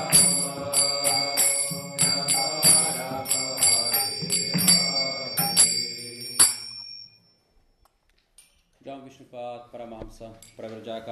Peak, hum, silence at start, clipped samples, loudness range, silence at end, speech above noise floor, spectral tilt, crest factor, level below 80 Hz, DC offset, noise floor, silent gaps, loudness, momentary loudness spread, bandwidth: -4 dBFS; none; 0 s; under 0.1%; 7 LU; 0 s; 29 dB; -1 dB/octave; 22 dB; -58 dBFS; under 0.1%; -67 dBFS; none; -20 LUFS; 23 LU; 14 kHz